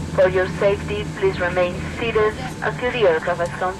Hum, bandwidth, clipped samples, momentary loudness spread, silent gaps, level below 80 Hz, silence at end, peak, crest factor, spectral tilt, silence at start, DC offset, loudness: none; 13 kHz; under 0.1%; 7 LU; none; -40 dBFS; 0 s; -6 dBFS; 14 dB; -6 dB/octave; 0 s; under 0.1%; -21 LUFS